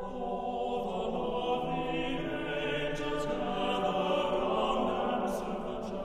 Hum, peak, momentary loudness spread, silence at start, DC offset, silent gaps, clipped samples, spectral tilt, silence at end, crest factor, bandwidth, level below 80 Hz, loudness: none; -16 dBFS; 5 LU; 0 s; under 0.1%; none; under 0.1%; -5.5 dB/octave; 0 s; 16 dB; 15.5 kHz; -48 dBFS; -33 LUFS